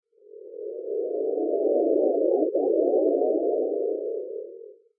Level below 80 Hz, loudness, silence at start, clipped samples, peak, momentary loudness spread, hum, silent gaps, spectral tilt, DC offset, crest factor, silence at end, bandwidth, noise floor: under -90 dBFS; -25 LUFS; 0.35 s; under 0.1%; -10 dBFS; 15 LU; none; none; -13 dB/octave; under 0.1%; 16 dB; 0.25 s; 0.9 kHz; -46 dBFS